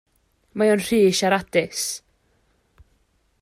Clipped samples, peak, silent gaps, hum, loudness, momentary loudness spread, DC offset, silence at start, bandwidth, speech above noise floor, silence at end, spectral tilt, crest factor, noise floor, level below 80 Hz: under 0.1%; -6 dBFS; none; none; -20 LUFS; 12 LU; under 0.1%; 0.55 s; 15.5 kHz; 45 dB; 1.45 s; -4 dB/octave; 16 dB; -65 dBFS; -58 dBFS